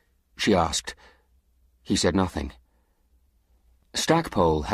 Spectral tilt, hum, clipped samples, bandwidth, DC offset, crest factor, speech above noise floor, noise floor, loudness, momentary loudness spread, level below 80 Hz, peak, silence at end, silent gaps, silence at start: -4.5 dB/octave; none; under 0.1%; 15 kHz; under 0.1%; 20 dB; 42 dB; -66 dBFS; -24 LUFS; 12 LU; -44 dBFS; -6 dBFS; 0 s; none; 0.4 s